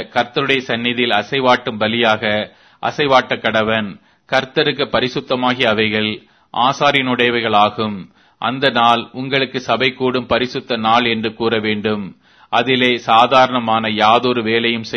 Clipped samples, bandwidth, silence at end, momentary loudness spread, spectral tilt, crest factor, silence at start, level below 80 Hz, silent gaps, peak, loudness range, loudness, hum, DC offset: under 0.1%; 11 kHz; 0 s; 9 LU; -5 dB/octave; 16 dB; 0 s; -54 dBFS; none; 0 dBFS; 3 LU; -16 LUFS; none; under 0.1%